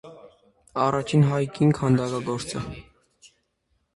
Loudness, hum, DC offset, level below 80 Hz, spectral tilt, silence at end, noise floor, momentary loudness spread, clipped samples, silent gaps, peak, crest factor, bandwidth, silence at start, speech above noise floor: -24 LUFS; none; under 0.1%; -54 dBFS; -7 dB/octave; 1.15 s; -72 dBFS; 13 LU; under 0.1%; none; -8 dBFS; 18 dB; 11.5 kHz; 0.05 s; 49 dB